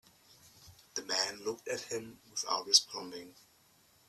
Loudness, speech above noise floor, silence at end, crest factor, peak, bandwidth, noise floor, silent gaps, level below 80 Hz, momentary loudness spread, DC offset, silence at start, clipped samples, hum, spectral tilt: -32 LUFS; 31 dB; 0.75 s; 30 dB; -8 dBFS; 15.5 kHz; -67 dBFS; none; -78 dBFS; 17 LU; under 0.1%; 0.45 s; under 0.1%; none; 0 dB/octave